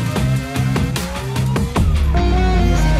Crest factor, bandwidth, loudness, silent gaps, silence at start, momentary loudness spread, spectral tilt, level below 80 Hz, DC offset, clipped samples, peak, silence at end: 10 dB; 15.5 kHz; -18 LUFS; none; 0 s; 5 LU; -6 dB/octave; -20 dBFS; under 0.1%; under 0.1%; -6 dBFS; 0 s